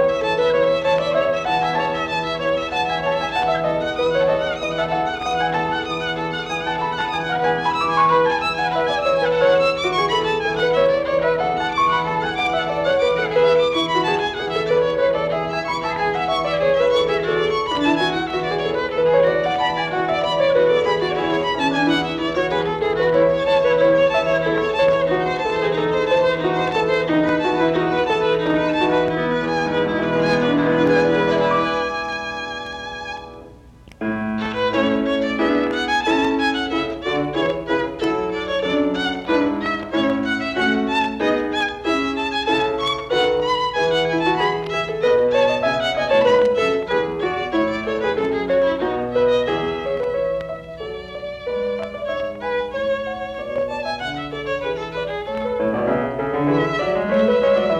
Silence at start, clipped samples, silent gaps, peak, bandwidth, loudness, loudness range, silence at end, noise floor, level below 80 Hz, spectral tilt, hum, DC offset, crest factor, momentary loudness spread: 0 s; under 0.1%; none; -4 dBFS; 9.8 kHz; -19 LUFS; 5 LU; 0 s; -44 dBFS; -46 dBFS; -5.5 dB/octave; none; under 0.1%; 14 dB; 8 LU